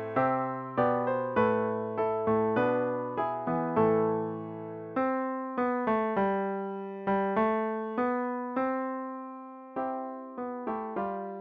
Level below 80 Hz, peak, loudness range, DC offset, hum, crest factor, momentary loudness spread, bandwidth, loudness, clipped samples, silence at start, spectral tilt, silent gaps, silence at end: -66 dBFS; -14 dBFS; 5 LU; under 0.1%; none; 16 dB; 10 LU; 5.2 kHz; -30 LUFS; under 0.1%; 0 s; -10 dB/octave; none; 0 s